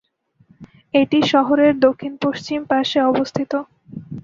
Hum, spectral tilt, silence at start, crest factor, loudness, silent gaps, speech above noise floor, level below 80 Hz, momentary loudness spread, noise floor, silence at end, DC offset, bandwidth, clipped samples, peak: none; -5.5 dB/octave; 0.6 s; 16 dB; -18 LUFS; none; 39 dB; -58 dBFS; 11 LU; -56 dBFS; 0.05 s; under 0.1%; 7.4 kHz; under 0.1%; -2 dBFS